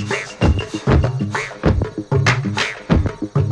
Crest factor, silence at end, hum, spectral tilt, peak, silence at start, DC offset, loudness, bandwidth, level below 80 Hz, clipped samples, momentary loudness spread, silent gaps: 16 dB; 0 s; none; -6 dB/octave; 0 dBFS; 0 s; under 0.1%; -19 LUFS; 11 kHz; -26 dBFS; under 0.1%; 5 LU; none